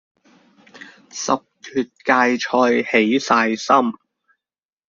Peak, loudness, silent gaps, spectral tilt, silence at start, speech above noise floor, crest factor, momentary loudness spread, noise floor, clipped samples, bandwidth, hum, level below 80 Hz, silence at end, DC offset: -2 dBFS; -18 LUFS; none; -3.5 dB/octave; 0.8 s; over 72 dB; 18 dB; 9 LU; under -90 dBFS; under 0.1%; 7.6 kHz; none; -64 dBFS; 0.95 s; under 0.1%